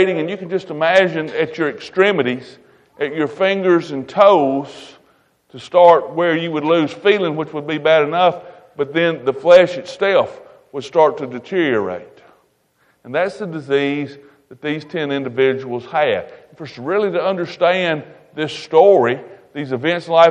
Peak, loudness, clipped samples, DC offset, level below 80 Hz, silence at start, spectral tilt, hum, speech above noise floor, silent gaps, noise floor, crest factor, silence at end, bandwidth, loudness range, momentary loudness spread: 0 dBFS; -17 LUFS; under 0.1%; under 0.1%; -64 dBFS; 0 s; -6 dB/octave; none; 44 dB; none; -60 dBFS; 16 dB; 0 s; 9 kHz; 6 LU; 15 LU